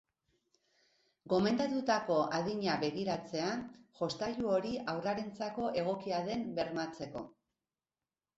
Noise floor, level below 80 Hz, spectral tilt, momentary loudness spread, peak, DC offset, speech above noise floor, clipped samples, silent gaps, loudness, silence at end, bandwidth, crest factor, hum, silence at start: under -90 dBFS; -70 dBFS; -4 dB/octave; 10 LU; -18 dBFS; under 0.1%; over 55 dB; under 0.1%; none; -35 LUFS; 1.05 s; 8 kHz; 18 dB; none; 1.25 s